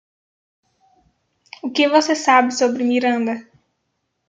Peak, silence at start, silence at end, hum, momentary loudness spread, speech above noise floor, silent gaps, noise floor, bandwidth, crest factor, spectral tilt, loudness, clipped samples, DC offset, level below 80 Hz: -2 dBFS; 1.65 s; 0.85 s; none; 10 LU; 56 dB; none; -73 dBFS; 9.2 kHz; 18 dB; -2.5 dB/octave; -17 LUFS; under 0.1%; under 0.1%; -72 dBFS